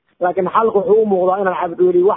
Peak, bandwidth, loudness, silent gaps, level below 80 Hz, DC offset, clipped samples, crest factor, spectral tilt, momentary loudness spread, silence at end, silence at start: -2 dBFS; 3.8 kHz; -15 LUFS; none; -58 dBFS; under 0.1%; under 0.1%; 14 dB; -12 dB/octave; 5 LU; 0 s; 0.2 s